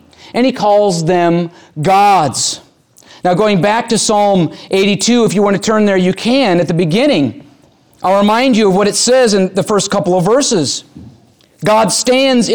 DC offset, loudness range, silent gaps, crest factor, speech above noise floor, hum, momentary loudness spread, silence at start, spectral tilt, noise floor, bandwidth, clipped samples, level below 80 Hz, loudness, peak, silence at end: 0.4%; 1 LU; none; 10 dB; 36 dB; none; 7 LU; 0.25 s; -4.5 dB/octave; -47 dBFS; over 20 kHz; under 0.1%; -50 dBFS; -12 LUFS; -2 dBFS; 0 s